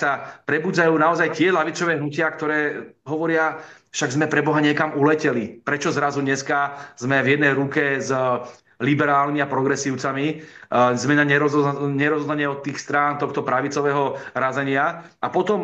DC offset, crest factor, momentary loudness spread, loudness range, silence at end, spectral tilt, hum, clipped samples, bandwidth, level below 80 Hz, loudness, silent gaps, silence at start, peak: under 0.1%; 18 dB; 8 LU; 2 LU; 0 s; -5.5 dB/octave; none; under 0.1%; 8.4 kHz; -68 dBFS; -21 LUFS; none; 0 s; -4 dBFS